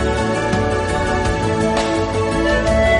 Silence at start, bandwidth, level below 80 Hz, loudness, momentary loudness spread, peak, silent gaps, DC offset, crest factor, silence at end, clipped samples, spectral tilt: 0 s; 10.5 kHz; -26 dBFS; -18 LUFS; 3 LU; -2 dBFS; none; 0.3%; 14 dB; 0 s; under 0.1%; -5.5 dB/octave